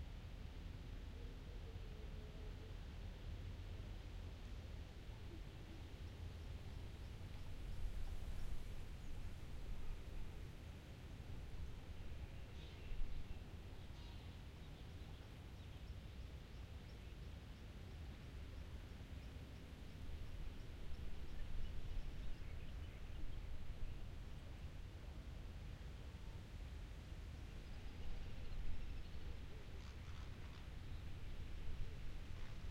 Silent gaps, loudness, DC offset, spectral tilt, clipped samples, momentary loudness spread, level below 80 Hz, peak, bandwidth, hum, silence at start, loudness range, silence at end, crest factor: none; -55 LUFS; under 0.1%; -6 dB/octave; under 0.1%; 3 LU; -52 dBFS; -32 dBFS; 14 kHz; none; 0 s; 2 LU; 0 s; 16 dB